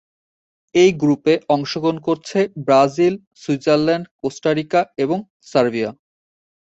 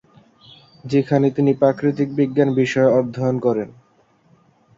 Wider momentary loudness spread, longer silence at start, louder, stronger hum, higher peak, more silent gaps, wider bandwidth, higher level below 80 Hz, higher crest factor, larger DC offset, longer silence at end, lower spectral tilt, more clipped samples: first, 9 LU vs 5 LU; about the same, 0.75 s vs 0.85 s; about the same, -18 LUFS vs -18 LUFS; neither; about the same, -2 dBFS vs -2 dBFS; first, 3.27-3.31 s, 4.11-4.19 s, 5.30-5.40 s vs none; about the same, 8.2 kHz vs 7.6 kHz; about the same, -60 dBFS vs -60 dBFS; about the same, 18 dB vs 18 dB; neither; second, 0.85 s vs 1.1 s; second, -6 dB/octave vs -8 dB/octave; neither